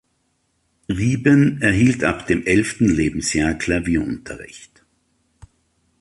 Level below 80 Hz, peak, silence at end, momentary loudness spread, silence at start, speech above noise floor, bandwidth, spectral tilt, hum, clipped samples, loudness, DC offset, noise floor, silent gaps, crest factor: -40 dBFS; -2 dBFS; 1.4 s; 13 LU; 0.9 s; 50 dB; 11.5 kHz; -5.5 dB/octave; none; under 0.1%; -18 LUFS; under 0.1%; -68 dBFS; none; 18 dB